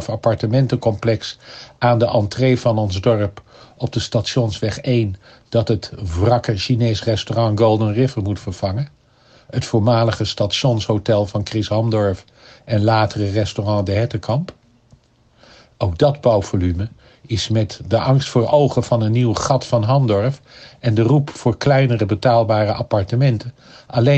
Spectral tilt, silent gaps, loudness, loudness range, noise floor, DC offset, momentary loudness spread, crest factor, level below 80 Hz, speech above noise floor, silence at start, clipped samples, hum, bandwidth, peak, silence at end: -6.5 dB/octave; none; -18 LUFS; 4 LU; -53 dBFS; under 0.1%; 9 LU; 16 dB; -46 dBFS; 36 dB; 0 s; under 0.1%; none; 8.4 kHz; -2 dBFS; 0 s